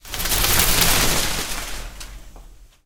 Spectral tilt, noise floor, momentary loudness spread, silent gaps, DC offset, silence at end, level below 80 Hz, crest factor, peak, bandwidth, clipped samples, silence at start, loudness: -1.5 dB/octave; -43 dBFS; 21 LU; none; under 0.1%; 0.2 s; -28 dBFS; 20 dB; 0 dBFS; 19 kHz; under 0.1%; 0.05 s; -18 LUFS